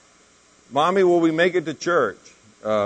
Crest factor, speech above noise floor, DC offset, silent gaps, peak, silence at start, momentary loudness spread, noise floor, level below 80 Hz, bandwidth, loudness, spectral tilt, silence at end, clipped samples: 16 dB; 36 dB; under 0.1%; none; -6 dBFS; 0.7 s; 9 LU; -55 dBFS; -68 dBFS; 9.4 kHz; -20 LUFS; -5.5 dB/octave; 0 s; under 0.1%